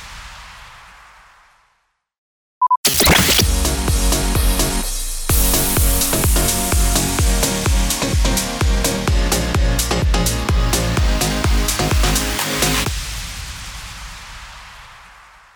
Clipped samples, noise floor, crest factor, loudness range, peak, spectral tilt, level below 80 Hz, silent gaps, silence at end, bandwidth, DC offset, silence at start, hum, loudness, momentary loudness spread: under 0.1%; -66 dBFS; 16 dB; 4 LU; -2 dBFS; -3 dB/octave; -22 dBFS; 2.18-2.61 s, 2.77-2.84 s; 0.6 s; over 20 kHz; under 0.1%; 0 s; none; -17 LUFS; 18 LU